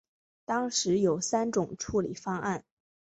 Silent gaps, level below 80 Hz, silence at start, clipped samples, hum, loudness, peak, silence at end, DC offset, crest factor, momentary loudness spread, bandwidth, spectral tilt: none; -60 dBFS; 0.5 s; under 0.1%; none; -30 LUFS; -14 dBFS; 0.55 s; under 0.1%; 16 dB; 8 LU; 8.4 kHz; -4 dB/octave